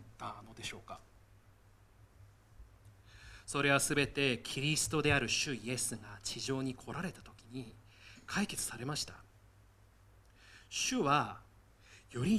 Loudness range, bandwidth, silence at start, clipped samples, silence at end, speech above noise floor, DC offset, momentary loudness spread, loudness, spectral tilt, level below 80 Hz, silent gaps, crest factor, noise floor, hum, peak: 9 LU; 15 kHz; 0 s; under 0.1%; 0 s; 28 dB; under 0.1%; 22 LU; -35 LUFS; -3.5 dB/octave; -60 dBFS; none; 24 dB; -63 dBFS; none; -14 dBFS